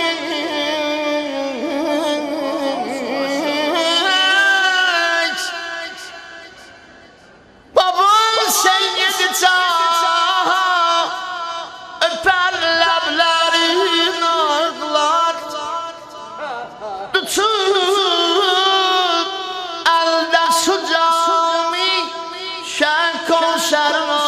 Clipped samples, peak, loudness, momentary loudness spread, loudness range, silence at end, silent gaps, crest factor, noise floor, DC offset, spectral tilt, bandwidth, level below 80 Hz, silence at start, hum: under 0.1%; -2 dBFS; -16 LUFS; 12 LU; 5 LU; 0 s; none; 16 dB; -45 dBFS; under 0.1%; -0.5 dB/octave; 14.5 kHz; -60 dBFS; 0 s; none